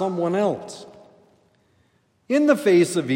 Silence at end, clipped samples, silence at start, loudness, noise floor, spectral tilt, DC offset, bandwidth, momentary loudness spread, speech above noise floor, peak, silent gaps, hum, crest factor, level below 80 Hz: 0 s; under 0.1%; 0 s; -20 LUFS; -64 dBFS; -5.5 dB/octave; under 0.1%; 16 kHz; 18 LU; 44 dB; -4 dBFS; none; none; 18 dB; -76 dBFS